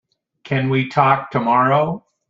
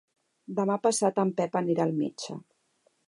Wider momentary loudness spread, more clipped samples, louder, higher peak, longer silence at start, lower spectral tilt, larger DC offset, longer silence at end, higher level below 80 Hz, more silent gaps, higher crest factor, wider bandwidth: second, 7 LU vs 14 LU; neither; first, -17 LUFS vs -28 LUFS; first, -2 dBFS vs -12 dBFS; about the same, 0.45 s vs 0.5 s; first, -8 dB/octave vs -5.5 dB/octave; neither; second, 0.3 s vs 0.7 s; first, -58 dBFS vs -80 dBFS; neither; about the same, 18 dB vs 18 dB; second, 7.4 kHz vs 11.5 kHz